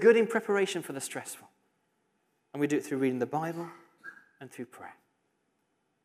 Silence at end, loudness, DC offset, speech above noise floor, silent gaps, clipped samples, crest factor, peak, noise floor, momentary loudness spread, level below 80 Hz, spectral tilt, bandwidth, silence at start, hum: 1.1 s; -30 LUFS; under 0.1%; 47 dB; none; under 0.1%; 22 dB; -10 dBFS; -77 dBFS; 21 LU; -86 dBFS; -5 dB/octave; 15.5 kHz; 0 s; none